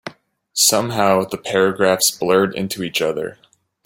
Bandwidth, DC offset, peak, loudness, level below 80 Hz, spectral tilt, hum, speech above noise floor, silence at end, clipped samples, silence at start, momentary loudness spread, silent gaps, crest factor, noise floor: 17 kHz; under 0.1%; 0 dBFS; -17 LUFS; -58 dBFS; -3 dB/octave; none; 23 dB; 0.55 s; under 0.1%; 0.05 s; 12 LU; none; 18 dB; -41 dBFS